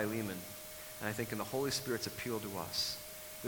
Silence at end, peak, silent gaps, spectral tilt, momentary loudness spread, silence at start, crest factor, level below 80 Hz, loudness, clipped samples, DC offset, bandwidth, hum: 0 s; -20 dBFS; none; -3.5 dB/octave; 10 LU; 0 s; 20 dB; -66 dBFS; -39 LUFS; under 0.1%; under 0.1%; 19 kHz; none